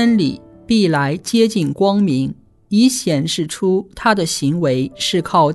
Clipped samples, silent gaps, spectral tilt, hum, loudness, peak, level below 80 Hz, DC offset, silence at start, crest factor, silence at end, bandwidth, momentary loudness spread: under 0.1%; none; -5 dB/octave; none; -17 LUFS; -2 dBFS; -50 dBFS; under 0.1%; 0 s; 14 dB; 0 s; 12.5 kHz; 5 LU